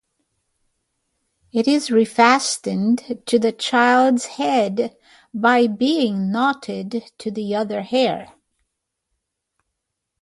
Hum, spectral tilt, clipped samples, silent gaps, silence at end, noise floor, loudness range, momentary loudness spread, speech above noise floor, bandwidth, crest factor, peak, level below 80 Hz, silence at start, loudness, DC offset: none; -4 dB/octave; under 0.1%; none; 1.95 s; -79 dBFS; 8 LU; 13 LU; 60 dB; 11.5 kHz; 20 dB; 0 dBFS; -66 dBFS; 1.55 s; -19 LUFS; under 0.1%